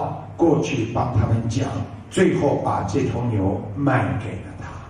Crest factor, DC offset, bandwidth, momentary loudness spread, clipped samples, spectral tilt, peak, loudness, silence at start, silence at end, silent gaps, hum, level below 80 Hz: 16 dB; under 0.1%; 10 kHz; 10 LU; under 0.1%; -7 dB/octave; -6 dBFS; -22 LUFS; 0 s; 0 s; none; none; -42 dBFS